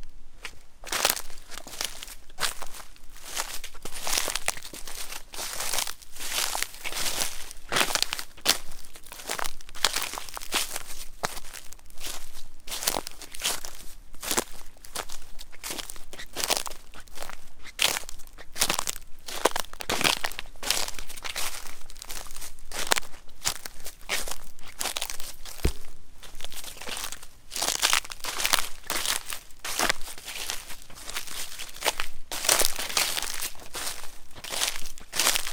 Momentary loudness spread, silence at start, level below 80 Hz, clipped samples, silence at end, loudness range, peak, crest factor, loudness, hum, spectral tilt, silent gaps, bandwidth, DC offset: 18 LU; 0 s; -42 dBFS; under 0.1%; 0 s; 6 LU; 0 dBFS; 28 dB; -29 LUFS; none; -0.5 dB/octave; none; 19 kHz; under 0.1%